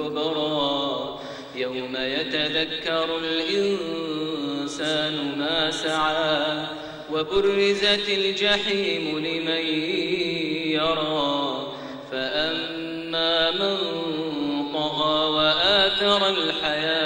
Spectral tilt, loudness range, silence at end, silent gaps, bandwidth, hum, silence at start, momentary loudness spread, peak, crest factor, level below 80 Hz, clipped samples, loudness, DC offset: -4 dB/octave; 4 LU; 0 s; none; 16 kHz; none; 0 s; 10 LU; -6 dBFS; 18 dB; -56 dBFS; under 0.1%; -23 LUFS; under 0.1%